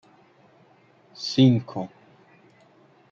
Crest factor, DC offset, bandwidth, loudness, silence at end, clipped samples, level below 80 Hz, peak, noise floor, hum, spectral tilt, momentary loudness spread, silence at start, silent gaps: 20 dB; under 0.1%; 7.4 kHz; -23 LUFS; 1.25 s; under 0.1%; -72 dBFS; -6 dBFS; -57 dBFS; none; -7 dB/octave; 17 LU; 1.2 s; none